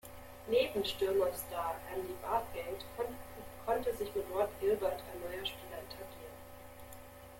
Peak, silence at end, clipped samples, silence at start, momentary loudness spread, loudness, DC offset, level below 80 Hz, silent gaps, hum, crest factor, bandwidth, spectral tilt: -20 dBFS; 0 s; under 0.1%; 0.05 s; 19 LU; -37 LUFS; under 0.1%; -58 dBFS; none; none; 18 dB; 17 kHz; -4 dB/octave